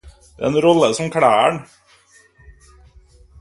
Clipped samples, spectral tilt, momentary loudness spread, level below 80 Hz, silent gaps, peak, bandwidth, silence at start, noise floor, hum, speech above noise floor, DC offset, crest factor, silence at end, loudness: under 0.1%; -5 dB/octave; 9 LU; -50 dBFS; none; 0 dBFS; 11.5 kHz; 0.05 s; -52 dBFS; none; 37 dB; under 0.1%; 18 dB; 1.8 s; -16 LUFS